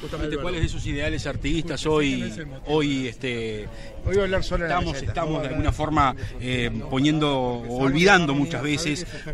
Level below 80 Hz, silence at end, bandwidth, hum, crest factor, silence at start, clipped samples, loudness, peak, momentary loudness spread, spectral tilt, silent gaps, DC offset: -34 dBFS; 0 s; 12.5 kHz; none; 20 dB; 0 s; under 0.1%; -24 LUFS; -4 dBFS; 9 LU; -5.5 dB/octave; none; under 0.1%